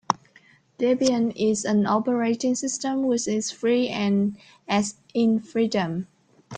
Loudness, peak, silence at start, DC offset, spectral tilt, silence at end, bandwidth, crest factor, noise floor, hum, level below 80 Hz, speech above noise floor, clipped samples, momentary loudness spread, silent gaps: -24 LUFS; -2 dBFS; 0.1 s; under 0.1%; -5 dB/octave; 0 s; 9.6 kHz; 22 dB; -57 dBFS; none; -64 dBFS; 33 dB; under 0.1%; 7 LU; none